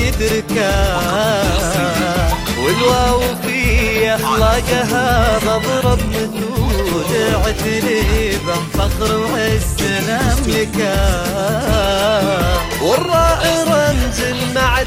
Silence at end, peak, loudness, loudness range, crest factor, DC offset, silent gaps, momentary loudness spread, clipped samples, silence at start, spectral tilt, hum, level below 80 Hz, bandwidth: 0 s; -2 dBFS; -15 LUFS; 2 LU; 14 dB; under 0.1%; none; 4 LU; under 0.1%; 0 s; -4.5 dB/octave; none; -22 dBFS; 16 kHz